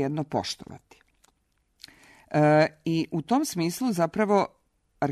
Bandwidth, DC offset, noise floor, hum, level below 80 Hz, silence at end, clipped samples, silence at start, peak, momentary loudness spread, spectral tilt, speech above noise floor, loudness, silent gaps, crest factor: 13.5 kHz; under 0.1%; -71 dBFS; none; -64 dBFS; 0 s; under 0.1%; 0 s; -8 dBFS; 12 LU; -6 dB/octave; 46 dB; -25 LUFS; none; 18 dB